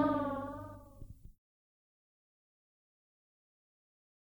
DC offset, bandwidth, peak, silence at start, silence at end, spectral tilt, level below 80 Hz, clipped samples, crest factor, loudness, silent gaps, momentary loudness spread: under 0.1%; over 20 kHz; -20 dBFS; 0 s; 3.05 s; -8 dB/octave; -60 dBFS; under 0.1%; 24 dB; -38 LUFS; none; 22 LU